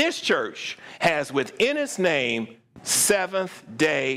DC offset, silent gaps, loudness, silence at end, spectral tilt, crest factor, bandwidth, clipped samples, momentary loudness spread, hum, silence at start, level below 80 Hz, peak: under 0.1%; none; -23 LUFS; 0 s; -2.5 dB/octave; 16 dB; 16 kHz; under 0.1%; 13 LU; none; 0 s; -64 dBFS; -8 dBFS